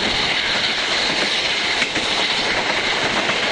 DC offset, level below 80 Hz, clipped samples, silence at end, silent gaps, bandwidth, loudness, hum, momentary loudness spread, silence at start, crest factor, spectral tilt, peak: under 0.1%; -46 dBFS; under 0.1%; 0 s; none; 11.5 kHz; -17 LUFS; none; 1 LU; 0 s; 14 dB; -1.5 dB/octave; -6 dBFS